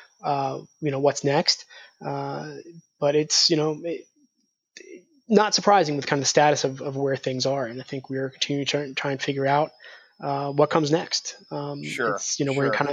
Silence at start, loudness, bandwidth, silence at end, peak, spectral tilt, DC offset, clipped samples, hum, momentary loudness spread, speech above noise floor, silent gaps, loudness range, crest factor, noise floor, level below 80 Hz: 0.25 s; -24 LUFS; 11 kHz; 0 s; -4 dBFS; -3.5 dB/octave; under 0.1%; under 0.1%; none; 14 LU; 49 dB; none; 4 LU; 20 dB; -73 dBFS; -74 dBFS